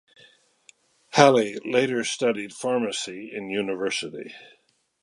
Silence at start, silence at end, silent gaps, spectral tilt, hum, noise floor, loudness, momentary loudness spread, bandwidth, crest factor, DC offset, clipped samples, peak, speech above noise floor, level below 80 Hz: 1.1 s; 0.6 s; none; -4 dB/octave; none; -58 dBFS; -24 LUFS; 17 LU; 11.5 kHz; 24 dB; under 0.1%; under 0.1%; 0 dBFS; 34 dB; -74 dBFS